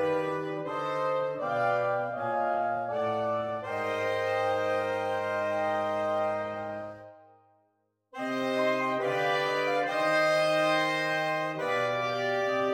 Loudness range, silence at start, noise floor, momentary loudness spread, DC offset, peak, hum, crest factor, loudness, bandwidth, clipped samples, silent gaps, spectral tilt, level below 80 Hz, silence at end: 5 LU; 0 s; -74 dBFS; 8 LU; under 0.1%; -16 dBFS; none; 14 dB; -29 LUFS; 16 kHz; under 0.1%; none; -4.5 dB/octave; -74 dBFS; 0 s